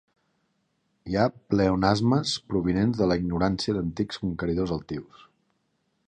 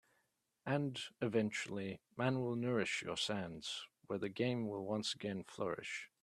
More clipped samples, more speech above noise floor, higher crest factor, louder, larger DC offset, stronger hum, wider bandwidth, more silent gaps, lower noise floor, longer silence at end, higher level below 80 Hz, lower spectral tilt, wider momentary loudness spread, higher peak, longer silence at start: neither; first, 48 dB vs 42 dB; about the same, 20 dB vs 20 dB; first, -26 LUFS vs -40 LUFS; neither; neither; second, 9.8 kHz vs 13 kHz; neither; second, -73 dBFS vs -82 dBFS; first, 1.05 s vs 0.15 s; first, -46 dBFS vs -78 dBFS; first, -6.5 dB/octave vs -5 dB/octave; about the same, 8 LU vs 8 LU; first, -6 dBFS vs -20 dBFS; first, 1.05 s vs 0.65 s